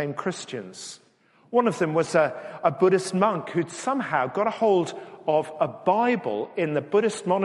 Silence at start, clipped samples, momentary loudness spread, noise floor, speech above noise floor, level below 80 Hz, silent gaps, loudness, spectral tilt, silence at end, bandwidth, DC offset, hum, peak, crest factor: 0 s; under 0.1%; 11 LU; -57 dBFS; 33 dB; -72 dBFS; none; -24 LUFS; -5.5 dB/octave; 0 s; 11.5 kHz; under 0.1%; none; -6 dBFS; 18 dB